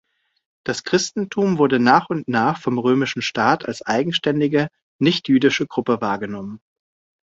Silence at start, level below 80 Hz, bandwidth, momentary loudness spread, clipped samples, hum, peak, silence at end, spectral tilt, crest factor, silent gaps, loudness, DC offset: 0.65 s; -60 dBFS; 7.8 kHz; 10 LU; under 0.1%; none; -2 dBFS; 0.65 s; -5 dB/octave; 18 dB; 4.82-4.99 s; -19 LUFS; under 0.1%